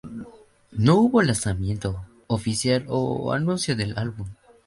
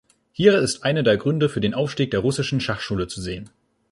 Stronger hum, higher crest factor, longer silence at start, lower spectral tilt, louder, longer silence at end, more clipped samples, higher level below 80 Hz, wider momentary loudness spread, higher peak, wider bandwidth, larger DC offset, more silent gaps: neither; about the same, 18 dB vs 20 dB; second, 0.05 s vs 0.4 s; about the same, -5.5 dB/octave vs -5.5 dB/octave; about the same, -23 LUFS vs -21 LUFS; about the same, 0.35 s vs 0.45 s; neither; about the same, -44 dBFS vs -48 dBFS; first, 18 LU vs 13 LU; second, -6 dBFS vs -2 dBFS; about the same, 11.5 kHz vs 11.5 kHz; neither; neither